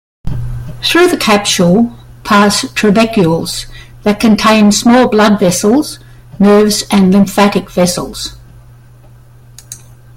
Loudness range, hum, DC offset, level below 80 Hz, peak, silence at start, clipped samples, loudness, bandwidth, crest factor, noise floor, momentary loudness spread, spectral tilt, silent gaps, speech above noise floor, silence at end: 3 LU; none; under 0.1%; -34 dBFS; 0 dBFS; 0.25 s; under 0.1%; -10 LUFS; 16.5 kHz; 10 dB; -38 dBFS; 16 LU; -4.5 dB/octave; none; 29 dB; 0.4 s